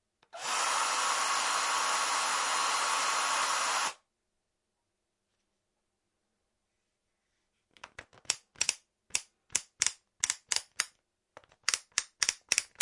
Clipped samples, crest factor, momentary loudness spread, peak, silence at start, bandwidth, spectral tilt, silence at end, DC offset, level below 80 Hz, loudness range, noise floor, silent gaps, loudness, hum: under 0.1%; 30 dB; 7 LU; -4 dBFS; 0.35 s; 11.5 kHz; 2 dB/octave; 0 s; under 0.1%; -76 dBFS; 10 LU; -83 dBFS; none; -30 LUFS; none